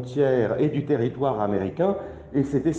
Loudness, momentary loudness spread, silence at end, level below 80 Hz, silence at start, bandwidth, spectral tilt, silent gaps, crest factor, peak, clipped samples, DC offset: -24 LUFS; 5 LU; 0 s; -52 dBFS; 0 s; 8.2 kHz; -8.5 dB/octave; none; 14 dB; -10 dBFS; under 0.1%; under 0.1%